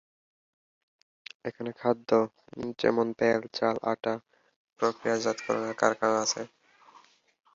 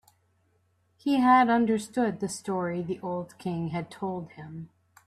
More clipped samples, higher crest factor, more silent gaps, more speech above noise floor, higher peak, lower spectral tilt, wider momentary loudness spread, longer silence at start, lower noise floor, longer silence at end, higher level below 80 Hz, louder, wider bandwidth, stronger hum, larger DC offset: neither; about the same, 22 dB vs 20 dB; first, 4.56-4.65 s vs none; second, 31 dB vs 43 dB; about the same, -8 dBFS vs -8 dBFS; second, -4 dB/octave vs -6 dB/octave; second, 13 LU vs 18 LU; first, 1.45 s vs 1.05 s; second, -59 dBFS vs -69 dBFS; first, 1.1 s vs 0.4 s; about the same, -70 dBFS vs -68 dBFS; about the same, -29 LUFS vs -27 LUFS; second, 7.8 kHz vs 13.5 kHz; neither; neither